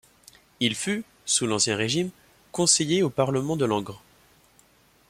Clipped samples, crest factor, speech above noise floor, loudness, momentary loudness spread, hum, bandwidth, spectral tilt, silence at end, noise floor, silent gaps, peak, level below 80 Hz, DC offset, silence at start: under 0.1%; 22 dB; 35 dB; -24 LUFS; 10 LU; none; 16 kHz; -3 dB/octave; 1.1 s; -59 dBFS; none; -4 dBFS; -62 dBFS; under 0.1%; 0.6 s